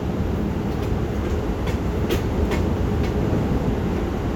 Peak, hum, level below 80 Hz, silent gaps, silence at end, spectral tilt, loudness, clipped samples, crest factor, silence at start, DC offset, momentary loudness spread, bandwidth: -8 dBFS; none; -28 dBFS; none; 0 s; -7.5 dB/octave; -23 LUFS; under 0.1%; 14 dB; 0 s; under 0.1%; 3 LU; 19.5 kHz